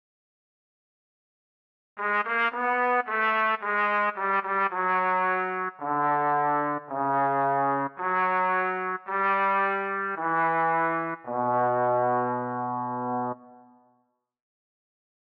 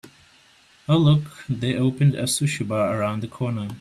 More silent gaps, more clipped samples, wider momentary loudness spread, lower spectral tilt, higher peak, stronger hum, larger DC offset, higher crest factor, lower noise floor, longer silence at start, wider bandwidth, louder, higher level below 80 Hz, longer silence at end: neither; neither; second, 6 LU vs 9 LU; first, -8 dB/octave vs -6 dB/octave; second, -14 dBFS vs -6 dBFS; neither; neither; about the same, 14 dB vs 16 dB; first, -72 dBFS vs -55 dBFS; first, 1.95 s vs 0.9 s; second, 5.8 kHz vs 13.5 kHz; second, -26 LUFS vs -22 LUFS; second, -82 dBFS vs -56 dBFS; first, 1.8 s vs 0 s